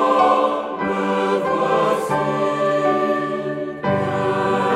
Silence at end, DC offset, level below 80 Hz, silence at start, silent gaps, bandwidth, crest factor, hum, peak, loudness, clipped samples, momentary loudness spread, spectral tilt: 0 s; under 0.1%; -58 dBFS; 0 s; none; 14.5 kHz; 16 dB; none; -2 dBFS; -19 LUFS; under 0.1%; 7 LU; -6 dB/octave